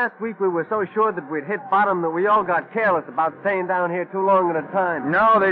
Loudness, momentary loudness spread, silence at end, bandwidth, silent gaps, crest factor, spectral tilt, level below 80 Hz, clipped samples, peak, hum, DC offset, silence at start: -21 LUFS; 6 LU; 0 s; 5.2 kHz; none; 12 dB; -9 dB/octave; -64 dBFS; under 0.1%; -8 dBFS; none; under 0.1%; 0 s